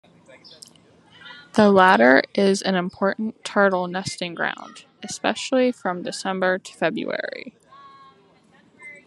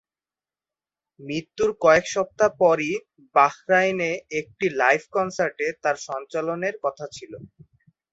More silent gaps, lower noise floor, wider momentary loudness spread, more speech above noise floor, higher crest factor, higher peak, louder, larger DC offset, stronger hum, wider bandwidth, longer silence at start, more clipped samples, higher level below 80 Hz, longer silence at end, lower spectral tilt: neither; second, -56 dBFS vs under -90 dBFS; first, 22 LU vs 13 LU; second, 35 dB vs over 67 dB; about the same, 22 dB vs 20 dB; first, 0 dBFS vs -4 dBFS; about the same, -21 LUFS vs -23 LUFS; neither; neither; first, 12 kHz vs 8 kHz; about the same, 1.25 s vs 1.2 s; neither; second, -68 dBFS vs -62 dBFS; second, 0.1 s vs 0.65 s; about the same, -4.5 dB/octave vs -4.5 dB/octave